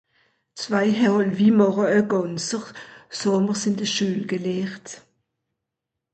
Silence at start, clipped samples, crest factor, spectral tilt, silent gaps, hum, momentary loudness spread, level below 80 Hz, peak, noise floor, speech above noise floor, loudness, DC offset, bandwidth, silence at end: 0.55 s; under 0.1%; 16 dB; -5 dB/octave; none; none; 18 LU; -66 dBFS; -6 dBFS; -84 dBFS; 62 dB; -22 LUFS; under 0.1%; 8.8 kHz; 1.15 s